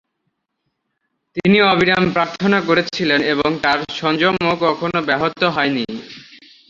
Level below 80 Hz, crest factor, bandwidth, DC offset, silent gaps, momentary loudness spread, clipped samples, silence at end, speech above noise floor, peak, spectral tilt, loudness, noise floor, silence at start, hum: -52 dBFS; 18 dB; 7.6 kHz; under 0.1%; none; 7 LU; under 0.1%; 0.35 s; 56 dB; 0 dBFS; -6 dB/octave; -16 LUFS; -73 dBFS; 1.35 s; none